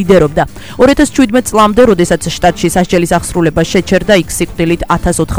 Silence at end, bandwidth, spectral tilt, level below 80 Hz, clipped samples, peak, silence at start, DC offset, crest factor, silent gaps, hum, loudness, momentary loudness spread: 0 s; over 20 kHz; -5 dB/octave; -26 dBFS; 0.6%; 0 dBFS; 0 s; 2%; 10 dB; none; none; -10 LUFS; 5 LU